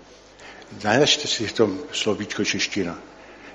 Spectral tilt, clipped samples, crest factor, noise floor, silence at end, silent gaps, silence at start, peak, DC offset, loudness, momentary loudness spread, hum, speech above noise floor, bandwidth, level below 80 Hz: -3 dB/octave; under 0.1%; 22 dB; -46 dBFS; 0 s; none; 0 s; -4 dBFS; under 0.1%; -22 LUFS; 23 LU; none; 23 dB; 10.5 kHz; -58 dBFS